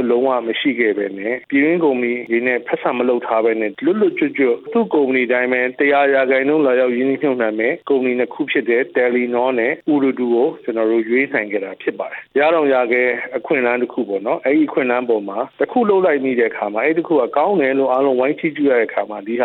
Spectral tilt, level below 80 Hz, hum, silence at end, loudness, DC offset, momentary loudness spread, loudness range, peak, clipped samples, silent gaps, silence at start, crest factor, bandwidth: -9 dB/octave; -72 dBFS; none; 0 s; -17 LUFS; under 0.1%; 6 LU; 2 LU; -2 dBFS; under 0.1%; none; 0 s; 14 dB; 4.2 kHz